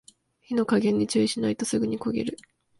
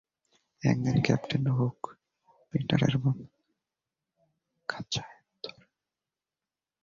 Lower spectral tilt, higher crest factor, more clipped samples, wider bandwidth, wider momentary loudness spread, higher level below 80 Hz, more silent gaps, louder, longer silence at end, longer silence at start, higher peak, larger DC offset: second, -5 dB/octave vs -6.5 dB/octave; second, 16 dB vs 22 dB; neither; first, 11.5 kHz vs 7.6 kHz; second, 8 LU vs 17 LU; about the same, -60 dBFS vs -60 dBFS; neither; first, -26 LUFS vs -30 LUFS; second, 0.45 s vs 1.3 s; second, 0.5 s vs 0.65 s; about the same, -10 dBFS vs -10 dBFS; neither